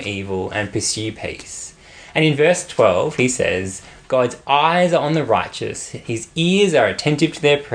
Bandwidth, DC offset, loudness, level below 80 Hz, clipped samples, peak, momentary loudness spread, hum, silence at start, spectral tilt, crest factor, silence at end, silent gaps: 10.5 kHz; under 0.1%; -18 LUFS; -52 dBFS; under 0.1%; -2 dBFS; 14 LU; none; 0 s; -4.5 dB/octave; 18 dB; 0 s; none